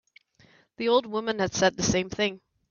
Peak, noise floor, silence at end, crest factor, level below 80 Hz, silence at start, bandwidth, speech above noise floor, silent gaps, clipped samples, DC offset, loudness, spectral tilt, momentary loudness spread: -10 dBFS; -60 dBFS; 0.35 s; 18 dB; -54 dBFS; 0.8 s; 7.4 kHz; 34 dB; none; under 0.1%; under 0.1%; -26 LUFS; -3.5 dB/octave; 6 LU